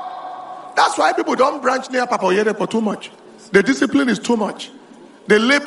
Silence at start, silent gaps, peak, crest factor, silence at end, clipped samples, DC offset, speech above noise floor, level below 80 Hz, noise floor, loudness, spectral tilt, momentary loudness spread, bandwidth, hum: 0 s; none; 0 dBFS; 18 dB; 0 s; under 0.1%; under 0.1%; 26 dB; -60 dBFS; -43 dBFS; -17 LUFS; -4 dB/octave; 17 LU; 11.5 kHz; none